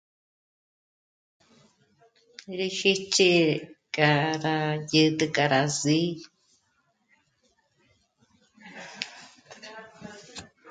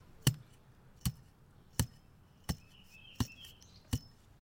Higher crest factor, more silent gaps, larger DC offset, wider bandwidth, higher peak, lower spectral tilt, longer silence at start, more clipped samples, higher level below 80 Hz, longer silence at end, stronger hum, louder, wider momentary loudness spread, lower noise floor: second, 22 dB vs 28 dB; neither; neither; second, 9.6 kHz vs 16.5 kHz; first, -6 dBFS vs -12 dBFS; about the same, -4 dB/octave vs -4 dB/octave; first, 2.5 s vs 0.25 s; neither; second, -70 dBFS vs -50 dBFS; second, 0 s vs 0.45 s; neither; first, -24 LUFS vs -40 LUFS; about the same, 23 LU vs 23 LU; first, -71 dBFS vs -62 dBFS